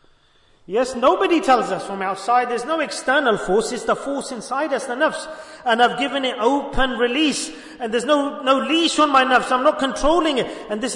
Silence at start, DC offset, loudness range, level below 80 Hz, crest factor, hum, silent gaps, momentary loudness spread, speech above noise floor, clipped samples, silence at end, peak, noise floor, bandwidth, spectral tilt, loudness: 0.7 s; under 0.1%; 3 LU; -40 dBFS; 16 dB; none; none; 10 LU; 36 dB; under 0.1%; 0 s; -4 dBFS; -56 dBFS; 11 kHz; -3 dB/octave; -19 LUFS